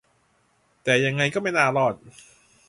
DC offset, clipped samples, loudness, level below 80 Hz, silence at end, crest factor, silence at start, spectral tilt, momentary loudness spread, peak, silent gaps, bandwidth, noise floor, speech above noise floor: under 0.1%; under 0.1%; -22 LUFS; -64 dBFS; 0.6 s; 22 dB; 0.85 s; -4.5 dB/octave; 9 LU; -4 dBFS; none; 11.5 kHz; -65 dBFS; 42 dB